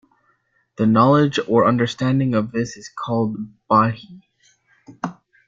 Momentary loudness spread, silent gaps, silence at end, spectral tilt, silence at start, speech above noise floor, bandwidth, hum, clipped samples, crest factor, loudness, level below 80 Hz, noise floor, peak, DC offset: 16 LU; none; 0.35 s; -7 dB/octave; 0.8 s; 46 dB; 7.6 kHz; none; under 0.1%; 18 dB; -18 LUFS; -58 dBFS; -64 dBFS; -2 dBFS; under 0.1%